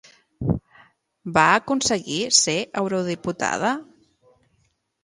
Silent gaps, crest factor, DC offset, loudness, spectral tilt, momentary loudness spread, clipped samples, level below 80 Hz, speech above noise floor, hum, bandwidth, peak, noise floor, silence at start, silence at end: none; 22 dB; under 0.1%; -21 LUFS; -3 dB/octave; 11 LU; under 0.1%; -48 dBFS; 46 dB; none; 11.5 kHz; -2 dBFS; -67 dBFS; 0.4 s; 1.2 s